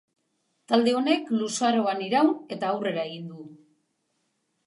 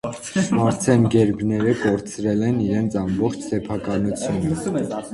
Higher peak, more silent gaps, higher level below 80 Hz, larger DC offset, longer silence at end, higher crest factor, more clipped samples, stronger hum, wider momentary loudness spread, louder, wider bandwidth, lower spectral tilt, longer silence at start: second, -8 dBFS vs -2 dBFS; neither; second, -84 dBFS vs -46 dBFS; neither; first, 1.1 s vs 0 s; about the same, 20 dB vs 18 dB; neither; neither; first, 12 LU vs 7 LU; second, -25 LUFS vs -21 LUFS; about the same, 11.5 kHz vs 11.5 kHz; second, -4.5 dB/octave vs -6.5 dB/octave; first, 0.7 s vs 0.05 s